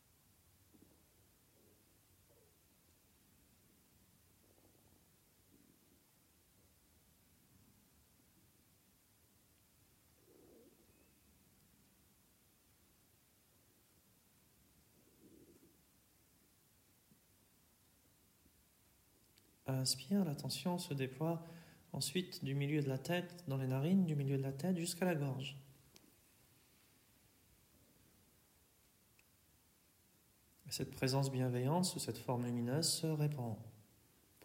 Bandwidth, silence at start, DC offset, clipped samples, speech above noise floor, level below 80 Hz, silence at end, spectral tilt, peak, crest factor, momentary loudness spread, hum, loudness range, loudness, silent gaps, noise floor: 16 kHz; 15.4 s; under 0.1%; under 0.1%; 33 dB; -78 dBFS; 0 s; -5 dB/octave; -24 dBFS; 22 dB; 15 LU; none; 8 LU; -39 LUFS; none; -72 dBFS